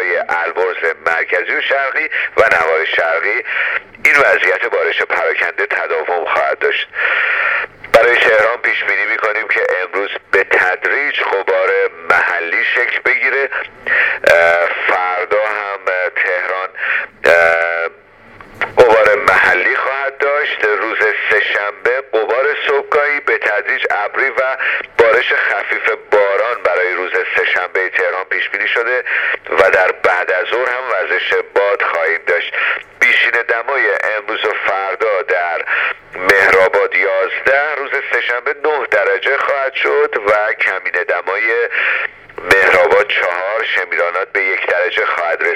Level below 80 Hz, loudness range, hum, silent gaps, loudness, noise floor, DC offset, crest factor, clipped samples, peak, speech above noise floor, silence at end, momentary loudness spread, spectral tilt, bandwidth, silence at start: -52 dBFS; 2 LU; none; none; -13 LUFS; -41 dBFS; under 0.1%; 14 dB; under 0.1%; 0 dBFS; 27 dB; 0 s; 7 LU; -2.5 dB/octave; 16 kHz; 0 s